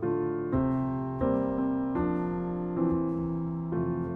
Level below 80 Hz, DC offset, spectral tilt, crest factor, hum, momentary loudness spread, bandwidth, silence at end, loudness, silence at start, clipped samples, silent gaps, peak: -48 dBFS; under 0.1%; -12 dB/octave; 14 dB; none; 4 LU; 3.6 kHz; 0 s; -30 LUFS; 0 s; under 0.1%; none; -14 dBFS